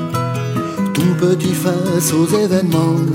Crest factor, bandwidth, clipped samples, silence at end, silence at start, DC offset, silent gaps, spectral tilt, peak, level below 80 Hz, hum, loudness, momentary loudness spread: 14 dB; 16.5 kHz; under 0.1%; 0 s; 0 s; under 0.1%; none; -6 dB/octave; -2 dBFS; -56 dBFS; none; -16 LUFS; 5 LU